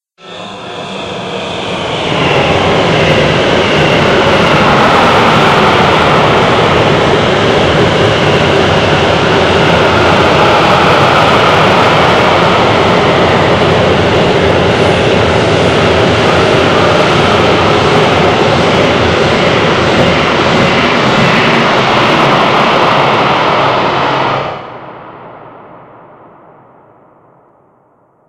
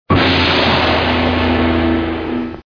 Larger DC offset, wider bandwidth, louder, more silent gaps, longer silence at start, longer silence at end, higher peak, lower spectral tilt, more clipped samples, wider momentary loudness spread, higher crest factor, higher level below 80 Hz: second, under 0.1% vs 0.4%; first, 16 kHz vs 5.4 kHz; first, -8 LUFS vs -14 LUFS; neither; first, 0.25 s vs 0.1 s; first, 2.5 s vs 0.1 s; about the same, 0 dBFS vs 0 dBFS; second, -5 dB/octave vs -6.5 dB/octave; first, 0.5% vs under 0.1%; about the same, 6 LU vs 8 LU; second, 8 dB vs 14 dB; second, -34 dBFS vs -28 dBFS